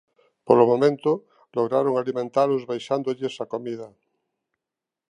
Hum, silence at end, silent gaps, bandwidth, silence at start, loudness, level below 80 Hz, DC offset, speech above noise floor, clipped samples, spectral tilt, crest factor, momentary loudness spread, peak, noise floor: none; 1.25 s; none; 10 kHz; 0.45 s; -23 LUFS; -76 dBFS; under 0.1%; 65 dB; under 0.1%; -7 dB/octave; 22 dB; 13 LU; -2 dBFS; -87 dBFS